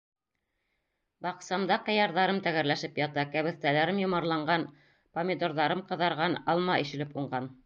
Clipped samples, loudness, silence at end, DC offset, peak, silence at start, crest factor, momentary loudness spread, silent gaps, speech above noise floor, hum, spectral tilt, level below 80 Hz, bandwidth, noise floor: under 0.1%; -29 LUFS; 0.1 s; under 0.1%; -12 dBFS; 1.2 s; 18 dB; 9 LU; none; 53 dB; none; -5.5 dB/octave; -72 dBFS; 7.4 kHz; -82 dBFS